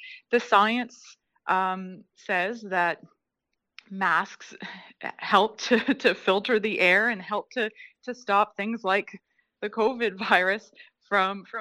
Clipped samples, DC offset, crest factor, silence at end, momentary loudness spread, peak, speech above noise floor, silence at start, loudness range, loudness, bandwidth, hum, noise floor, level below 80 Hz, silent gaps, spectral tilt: under 0.1%; under 0.1%; 22 dB; 0 s; 17 LU; -4 dBFS; 57 dB; 0 s; 5 LU; -25 LUFS; 14.5 kHz; none; -82 dBFS; -74 dBFS; none; -4 dB/octave